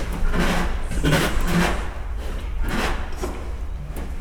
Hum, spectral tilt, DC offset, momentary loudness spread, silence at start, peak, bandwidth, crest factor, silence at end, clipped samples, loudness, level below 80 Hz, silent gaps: none; -5 dB/octave; under 0.1%; 12 LU; 0 s; -6 dBFS; 17.5 kHz; 16 dB; 0 s; under 0.1%; -25 LUFS; -24 dBFS; none